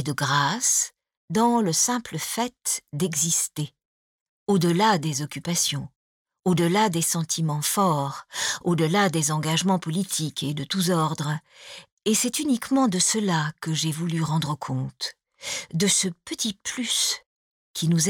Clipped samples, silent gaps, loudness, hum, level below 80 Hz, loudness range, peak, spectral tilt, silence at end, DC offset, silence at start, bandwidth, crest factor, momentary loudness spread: under 0.1%; 1.17-1.28 s, 3.85-4.46 s, 5.96-6.25 s, 11.92-11.97 s, 17.26-17.74 s; -24 LUFS; none; -64 dBFS; 2 LU; -8 dBFS; -3.5 dB/octave; 0 s; under 0.1%; 0 s; 18.5 kHz; 16 dB; 10 LU